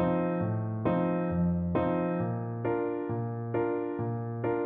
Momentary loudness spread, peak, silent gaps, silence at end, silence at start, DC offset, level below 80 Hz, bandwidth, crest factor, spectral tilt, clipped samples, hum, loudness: 5 LU; -14 dBFS; none; 0 s; 0 s; under 0.1%; -54 dBFS; 3.7 kHz; 16 dB; -9 dB/octave; under 0.1%; none; -31 LUFS